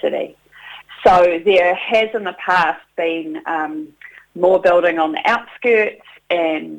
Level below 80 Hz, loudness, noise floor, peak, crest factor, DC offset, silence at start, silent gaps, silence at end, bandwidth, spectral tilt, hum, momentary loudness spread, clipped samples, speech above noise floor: -52 dBFS; -16 LUFS; -39 dBFS; 0 dBFS; 16 dB; under 0.1%; 0.05 s; none; 0 s; 9 kHz; -5 dB/octave; none; 17 LU; under 0.1%; 23 dB